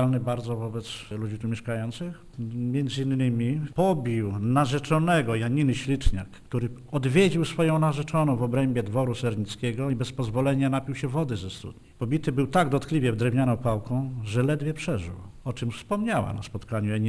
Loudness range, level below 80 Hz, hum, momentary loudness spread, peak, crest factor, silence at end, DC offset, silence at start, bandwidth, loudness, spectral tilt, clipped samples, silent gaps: 4 LU; -42 dBFS; none; 10 LU; -8 dBFS; 18 dB; 0 s; under 0.1%; 0 s; 11 kHz; -27 LUFS; -7 dB/octave; under 0.1%; none